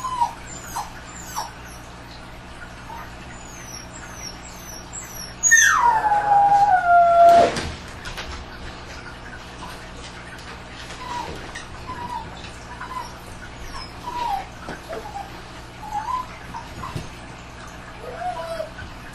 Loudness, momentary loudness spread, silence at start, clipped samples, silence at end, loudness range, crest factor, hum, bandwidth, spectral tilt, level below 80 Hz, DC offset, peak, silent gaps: -20 LUFS; 23 LU; 0 s; under 0.1%; 0 s; 19 LU; 20 dB; 60 Hz at -45 dBFS; 13.5 kHz; -2.5 dB/octave; -42 dBFS; under 0.1%; -4 dBFS; none